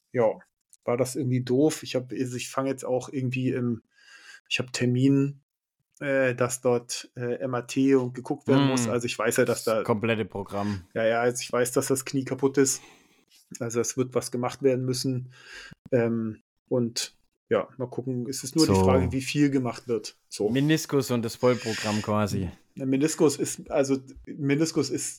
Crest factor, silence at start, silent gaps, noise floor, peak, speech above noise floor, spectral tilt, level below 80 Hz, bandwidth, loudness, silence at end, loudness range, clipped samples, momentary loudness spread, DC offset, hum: 18 dB; 0.15 s; 0.53-0.57 s, 4.40-4.45 s, 5.43-5.49 s, 15.79-15.85 s, 16.41-16.66 s, 17.37-17.47 s; -61 dBFS; -10 dBFS; 35 dB; -5 dB/octave; -60 dBFS; 17.5 kHz; -26 LUFS; 0 s; 4 LU; under 0.1%; 10 LU; under 0.1%; none